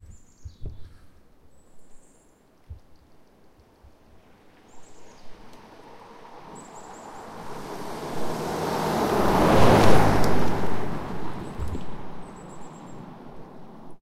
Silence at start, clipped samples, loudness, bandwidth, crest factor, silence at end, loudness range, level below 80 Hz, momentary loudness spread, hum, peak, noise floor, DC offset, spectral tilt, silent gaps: 0.4 s; under 0.1%; -24 LUFS; 16 kHz; 22 dB; 0.05 s; 22 LU; -40 dBFS; 28 LU; none; -2 dBFS; -57 dBFS; under 0.1%; -6 dB/octave; none